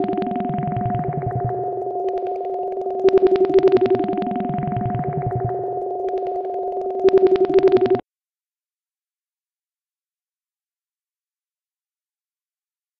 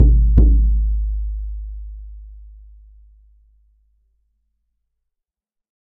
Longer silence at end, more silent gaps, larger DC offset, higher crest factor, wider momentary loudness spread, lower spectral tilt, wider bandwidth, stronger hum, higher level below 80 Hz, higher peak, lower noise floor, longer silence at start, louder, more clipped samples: first, 5 s vs 3.55 s; neither; neither; about the same, 16 dB vs 18 dB; second, 10 LU vs 25 LU; second, -9.5 dB/octave vs -14.5 dB/octave; first, 5.4 kHz vs 1 kHz; neither; second, -50 dBFS vs -20 dBFS; second, -6 dBFS vs 0 dBFS; first, under -90 dBFS vs -83 dBFS; about the same, 0 s vs 0 s; about the same, -20 LUFS vs -18 LUFS; neither